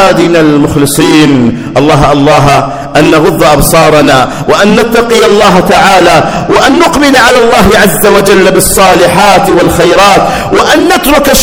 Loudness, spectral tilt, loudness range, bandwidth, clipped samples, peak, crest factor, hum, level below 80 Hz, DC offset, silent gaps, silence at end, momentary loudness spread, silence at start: -4 LUFS; -4.5 dB/octave; 1 LU; over 20 kHz; 20%; 0 dBFS; 4 dB; none; -24 dBFS; under 0.1%; none; 0 s; 4 LU; 0 s